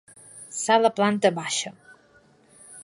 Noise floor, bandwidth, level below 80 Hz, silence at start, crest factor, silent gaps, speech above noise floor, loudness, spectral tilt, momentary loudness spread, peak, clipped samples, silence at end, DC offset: -58 dBFS; 11.5 kHz; -76 dBFS; 0.35 s; 20 dB; none; 36 dB; -23 LUFS; -3.5 dB/octave; 16 LU; -6 dBFS; under 0.1%; 0 s; under 0.1%